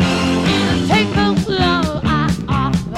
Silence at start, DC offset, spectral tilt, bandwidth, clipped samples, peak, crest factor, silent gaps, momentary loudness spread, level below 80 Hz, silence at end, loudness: 0 s; under 0.1%; -5.5 dB/octave; 13.5 kHz; under 0.1%; -4 dBFS; 12 dB; none; 3 LU; -30 dBFS; 0 s; -16 LUFS